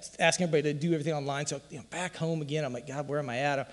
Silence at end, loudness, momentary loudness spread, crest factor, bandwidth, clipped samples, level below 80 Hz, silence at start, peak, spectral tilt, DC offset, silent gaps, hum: 0 s; -31 LUFS; 9 LU; 22 dB; 12 kHz; under 0.1%; -68 dBFS; 0 s; -10 dBFS; -4.5 dB/octave; under 0.1%; none; none